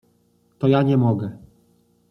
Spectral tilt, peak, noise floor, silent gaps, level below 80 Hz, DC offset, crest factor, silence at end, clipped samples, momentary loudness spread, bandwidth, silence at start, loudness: -10 dB/octave; -6 dBFS; -62 dBFS; none; -60 dBFS; under 0.1%; 16 dB; 0.75 s; under 0.1%; 10 LU; 5.8 kHz; 0.6 s; -20 LUFS